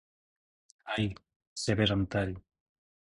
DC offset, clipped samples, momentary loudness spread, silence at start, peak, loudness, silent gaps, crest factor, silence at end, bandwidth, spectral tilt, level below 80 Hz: under 0.1%; under 0.1%; 20 LU; 0.85 s; -12 dBFS; -32 LUFS; 1.36-1.40 s, 1.47-1.56 s; 22 dB; 0.75 s; 11.5 kHz; -5 dB/octave; -52 dBFS